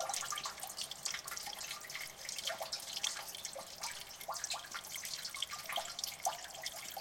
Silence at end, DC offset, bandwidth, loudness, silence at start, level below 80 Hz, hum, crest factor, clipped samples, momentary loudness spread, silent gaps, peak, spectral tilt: 0 s; under 0.1%; 17 kHz; -41 LUFS; 0 s; -74 dBFS; none; 24 dB; under 0.1%; 5 LU; none; -18 dBFS; 1 dB/octave